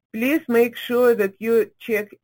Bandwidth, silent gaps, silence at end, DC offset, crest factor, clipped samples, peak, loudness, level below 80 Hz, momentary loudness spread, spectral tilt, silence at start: 17 kHz; none; 0.2 s; under 0.1%; 14 dB; under 0.1%; -6 dBFS; -20 LUFS; -68 dBFS; 6 LU; -5 dB/octave; 0.15 s